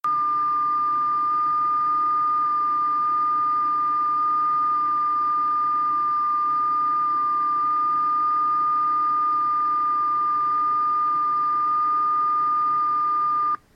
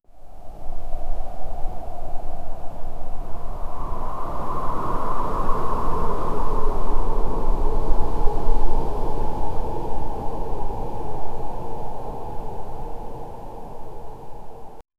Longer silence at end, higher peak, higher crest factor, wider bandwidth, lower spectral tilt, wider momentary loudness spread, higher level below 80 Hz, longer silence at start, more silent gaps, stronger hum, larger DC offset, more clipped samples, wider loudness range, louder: first, 0.2 s vs 0 s; second, -16 dBFS vs -2 dBFS; second, 4 dB vs 14 dB; first, 5.4 kHz vs 2.5 kHz; second, -5.5 dB/octave vs -8 dB/octave; second, 1 LU vs 12 LU; second, -64 dBFS vs -24 dBFS; about the same, 0.05 s vs 0 s; neither; neither; neither; neither; second, 0 LU vs 9 LU; first, -21 LUFS vs -30 LUFS